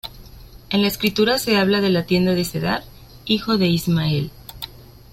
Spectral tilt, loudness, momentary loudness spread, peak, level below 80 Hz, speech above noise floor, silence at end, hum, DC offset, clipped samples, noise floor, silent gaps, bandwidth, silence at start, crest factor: -5.5 dB/octave; -19 LUFS; 17 LU; -4 dBFS; -44 dBFS; 23 dB; 0.3 s; none; under 0.1%; under 0.1%; -41 dBFS; none; 16.5 kHz; 0.05 s; 16 dB